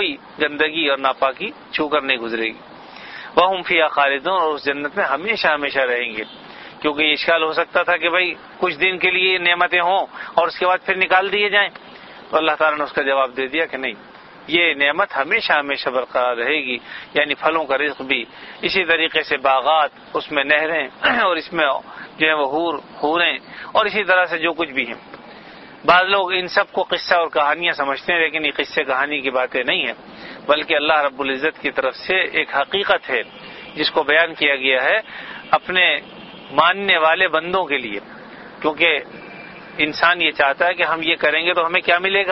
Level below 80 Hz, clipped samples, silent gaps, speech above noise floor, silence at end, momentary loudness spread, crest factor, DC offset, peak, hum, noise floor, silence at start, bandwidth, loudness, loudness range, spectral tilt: -58 dBFS; under 0.1%; none; 21 dB; 0 s; 11 LU; 20 dB; under 0.1%; 0 dBFS; none; -40 dBFS; 0 s; 6 kHz; -18 LUFS; 3 LU; -5 dB/octave